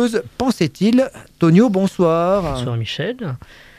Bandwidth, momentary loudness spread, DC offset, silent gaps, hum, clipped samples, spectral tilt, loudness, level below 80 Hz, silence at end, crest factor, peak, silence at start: 14.5 kHz; 11 LU; under 0.1%; none; none; under 0.1%; -7 dB/octave; -17 LUFS; -42 dBFS; 0.4 s; 16 dB; -2 dBFS; 0 s